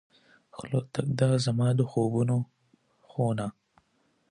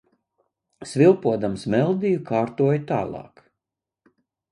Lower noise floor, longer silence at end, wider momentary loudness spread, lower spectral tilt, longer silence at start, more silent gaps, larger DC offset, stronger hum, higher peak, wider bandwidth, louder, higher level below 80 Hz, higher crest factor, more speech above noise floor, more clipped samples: second, -71 dBFS vs -86 dBFS; second, 0.8 s vs 1.3 s; about the same, 15 LU vs 14 LU; about the same, -7 dB/octave vs -7.5 dB/octave; second, 0.55 s vs 0.8 s; neither; neither; neither; second, -12 dBFS vs -4 dBFS; about the same, 11 kHz vs 11 kHz; second, -28 LUFS vs -22 LUFS; about the same, -64 dBFS vs -60 dBFS; about the same, 18 dB vs 18 dB; second, 44 dB vs 65 dB; neither